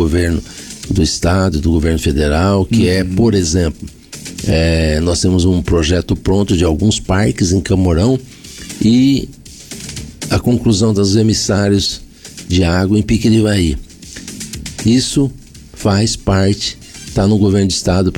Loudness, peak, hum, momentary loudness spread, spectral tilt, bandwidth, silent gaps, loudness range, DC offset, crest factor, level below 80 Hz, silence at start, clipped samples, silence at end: -14 LUFS; -4 dBFS; none; 16 LU; -5.5 dB/octave; 18 kHz; none; 2 LU; under 0.1%; 10 dB; -26 dBFS; 0 s; under 0.1%; 0 s